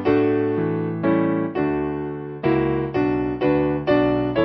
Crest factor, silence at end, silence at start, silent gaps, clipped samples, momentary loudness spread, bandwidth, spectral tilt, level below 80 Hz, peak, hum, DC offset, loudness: 14 dB; 0 s; 0 s; none; under 0.1%; 6 LU; 5.8 kHz; -10 dB/octave; -44 dBFS; -6 dBFS; none; under 0.1%; -21 LUFS